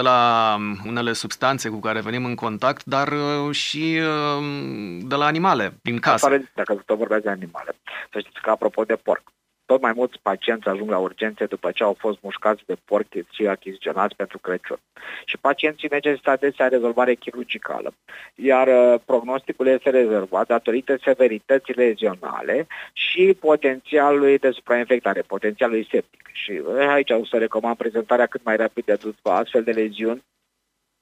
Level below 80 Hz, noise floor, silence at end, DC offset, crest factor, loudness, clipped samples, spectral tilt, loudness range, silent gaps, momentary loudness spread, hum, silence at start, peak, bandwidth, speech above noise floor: -70 dBFS; -75 dBFS; 0.85 s; under 0.1%; 18 dB; -21 LUFS; under 0.1%; -5 dB/octave; 5 LU; none; 11 LU; none; 0 s; -4 dBFS; 15.5 kHz; 54 dB